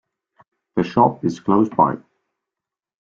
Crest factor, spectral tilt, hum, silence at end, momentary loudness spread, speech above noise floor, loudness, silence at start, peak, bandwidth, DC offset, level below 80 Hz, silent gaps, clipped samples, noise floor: 20 dB; -8 dB/octave; none; 1.05 s; 9 LU; 69 dB; -19 LUFS; 0.75 s; -2 dBFS; 7.6 kHz; under 0.1%; -58 dBFS; none; under 0.1%; -87 dBFS